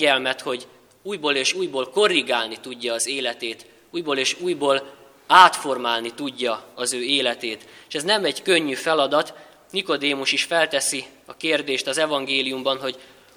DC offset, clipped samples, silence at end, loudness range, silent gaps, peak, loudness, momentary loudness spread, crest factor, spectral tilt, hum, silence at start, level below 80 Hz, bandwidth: under 0.1%; under 0.1%; 0.3 s; 3 LU; none; 0 dBFS; -21 LUFS; 12 LU; 22 dB; -1.5 dB/octave; none; 0 s; -72 dBFS; 19.5 kHz